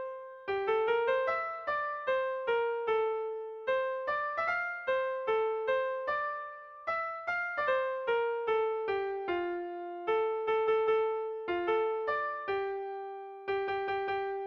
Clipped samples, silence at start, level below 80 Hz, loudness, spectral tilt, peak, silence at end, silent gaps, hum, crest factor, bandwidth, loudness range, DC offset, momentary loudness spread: under 0.1%; 0 s; -70 dBFS; -32 LUFS; -5.5 dB/octave; -20 dBFS; 0 s; none; none; 14 dB; 6.2 kHz; 1 LU; under 0.1%; 9 LU